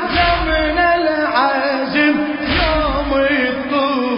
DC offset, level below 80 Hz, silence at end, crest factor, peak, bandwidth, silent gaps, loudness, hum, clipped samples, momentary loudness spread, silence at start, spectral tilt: under 0.1%; -28 dBFS; 0 s; 14 dB; -2 dBFS; 5.4 kHz; none; -16 LUFS; none; under 0.1%; 3 LU; 0 s; -9.5 dB/octave